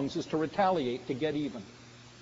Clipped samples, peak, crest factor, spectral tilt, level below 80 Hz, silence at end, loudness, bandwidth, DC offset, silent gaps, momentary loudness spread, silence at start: under 0.1%; -14 dBFS; 18 dB; -4.5 dB/octave; -64 dBFS; 0 s; -32 LUFS; 7.6 kHz; under 0.1%; none; 22 LU; 0 s